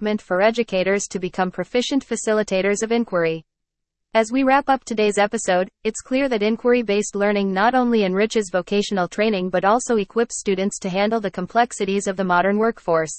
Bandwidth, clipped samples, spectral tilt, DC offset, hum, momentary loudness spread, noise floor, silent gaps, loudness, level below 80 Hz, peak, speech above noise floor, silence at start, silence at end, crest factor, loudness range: 8.8 kHz; under 0.1%; -4.5 dB/octave; under 0.1%; none; 5 LU; -80 dBFS; none; -20 LUFS; -54 dBFS; -4 dBFS; 60 dB; 0 s; 0 s; 16 dB; 2 LU